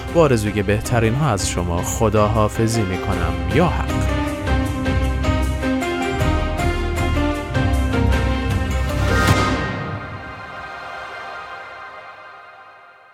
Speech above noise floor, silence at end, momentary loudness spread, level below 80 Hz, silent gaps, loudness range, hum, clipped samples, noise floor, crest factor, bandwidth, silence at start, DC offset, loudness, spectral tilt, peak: 27 dB; 0.35 s; 15 LU; -26 dBFS; none; 4 LU; none; under 0.1%; -45 dBFS; 16 dB; 16 kHz; 0 s; under 0.1%; -20 LUFS; -5.5 dB/octave; -2 dBFS